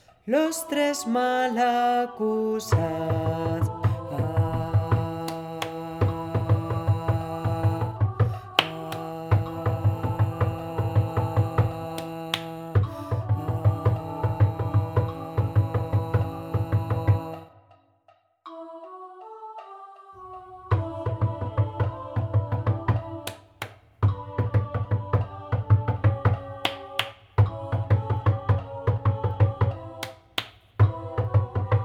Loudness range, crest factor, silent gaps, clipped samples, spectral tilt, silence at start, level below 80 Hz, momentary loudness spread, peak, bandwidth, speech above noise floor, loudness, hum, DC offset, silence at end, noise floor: 5 LU; 24 dB; none; under 0.1%; -6.5 dB/octave; 0.25 s; -46 dBFS; 14 LU; 0 dBFS; 15 kHz; 38 dB; -26 LUFS; none; under 0.1%; 0 s; -62 dBFS